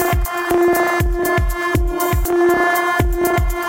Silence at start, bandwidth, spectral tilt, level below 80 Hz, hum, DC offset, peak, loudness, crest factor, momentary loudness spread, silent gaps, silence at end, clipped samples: 0 s; 17 kHz; -5.5 dB/octave; -22 dBFS; none; under 0.1%; -2 dBFS; -17 LUFS; 14 dB; 4 LU; none; 0 s; under 0.1%